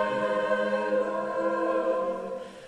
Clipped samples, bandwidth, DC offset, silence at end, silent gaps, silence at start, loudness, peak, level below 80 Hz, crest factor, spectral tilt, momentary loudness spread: under 0.1%; 10 kHz; under 0.1%; 0 s; none; 0 s; -28 LUFS; -12 dBFS; -68 dBFS; 16 dB; -5.5 dB/octave; 5 LU